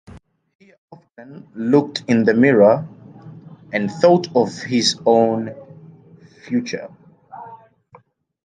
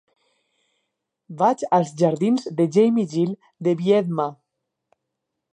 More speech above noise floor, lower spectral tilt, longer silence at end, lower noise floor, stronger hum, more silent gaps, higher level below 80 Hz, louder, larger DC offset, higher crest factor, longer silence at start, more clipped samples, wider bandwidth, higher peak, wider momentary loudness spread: second, 34 dB vs 60 dB; second, -5.5 dB/octave vs -7.5 dB/octave; second, 0.9 s vs 1.2 s; second, -51 dBFS vs -80 dBFS; neither; first, 0.55-0.59 s, 0.78-0.88 s vs none; first, -60 dBFS vs -74 dBFS; first, -17 LUFS vs -21 LUFS; neither; about the same, 18 dB vs 18 dB; second, 0.15 s vs 1.3 s; neither; about the same, 9.6 kHz vs 10 kHz; first, -2 dBFS vs -6 dBFS; first, 24 LU vs 8 LU